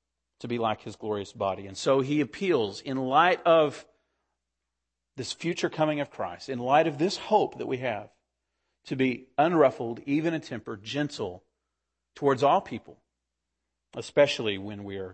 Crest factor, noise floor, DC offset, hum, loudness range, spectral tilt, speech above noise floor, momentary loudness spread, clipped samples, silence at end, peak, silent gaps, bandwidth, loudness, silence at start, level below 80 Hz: 20 dB; -85 dBFS; under 0.1%; none; 4 LU; -5.5 dB/octave; 58 dB; 15 LU; under 0.1%; 0 s; -8 dBFS; none; 8.8 kHz; -27 LUFS; 0.4 s; -70 dBFS